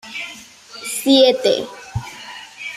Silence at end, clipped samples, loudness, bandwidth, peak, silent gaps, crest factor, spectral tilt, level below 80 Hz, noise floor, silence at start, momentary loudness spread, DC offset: 0 s; under 0.1%; -16 LUFS; 16 kHz; -2 dBFS; none; 18 dB; -3.5 dB/octave; -50 dBFS; -39 dBFS; 0.05 s; 21 LU; under 0.1%